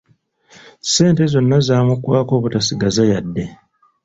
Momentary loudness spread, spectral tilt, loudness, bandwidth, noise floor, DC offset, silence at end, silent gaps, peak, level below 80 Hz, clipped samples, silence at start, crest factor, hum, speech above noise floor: 12 LU; -5.5 dB/octave; -16 LUFS; 8 kHz; -55 dBFS; under 0.1%; 0.5 s; none; 0 dBFS; -46 dBFS; under 0.1%; 0.85 s; 16 dB; none; 40 dB